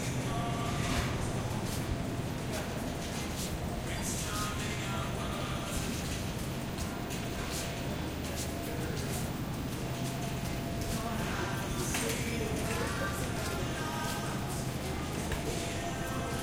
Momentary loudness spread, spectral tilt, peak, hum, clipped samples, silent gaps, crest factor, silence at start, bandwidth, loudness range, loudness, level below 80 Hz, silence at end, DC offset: 4 LU; -4.5 dB/octave; -20 dBFS; none; under 0.1%; none; 16 dB; 0 s; 16.5 kHz; 2 LU; -35 LUFS; -46 dBFS; 0 s; under 0.1%